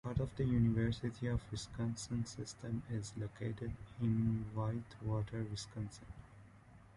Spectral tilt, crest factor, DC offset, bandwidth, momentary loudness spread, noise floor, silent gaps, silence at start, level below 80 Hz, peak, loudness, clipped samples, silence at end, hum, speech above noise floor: -6.5 dB/octave; 16 dB; under 0.1%; 11 kHz; 12 LU; -61 dBFS; none; 0.05 s; -54 dBFS; -22 dBFS; -40 LUFS; under 0.1%; 0 s; none; 22 dB